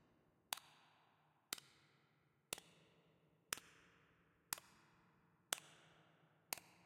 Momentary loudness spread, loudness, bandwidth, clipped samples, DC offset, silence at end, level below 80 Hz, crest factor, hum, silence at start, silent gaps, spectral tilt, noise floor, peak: 21 LU; -50 LUFS; 16 kHz; under 0.1%; under 0.1%; 0.05 s; -88 dBFS; 42 dB; none; 0.5 s; none; 0 dB/octave; -79 dBFS; -14 dBFS